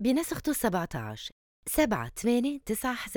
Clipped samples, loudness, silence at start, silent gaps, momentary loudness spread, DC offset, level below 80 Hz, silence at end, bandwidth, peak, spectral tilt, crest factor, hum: under 0.1%; -30 LUFS; 0 s; 1.32-1.63 s; 12 LU; under 0.1%; -50 dBFS; 0 s; over 20 kHz; -12 dBFS; -4.5 dB/octave; 18 dB; none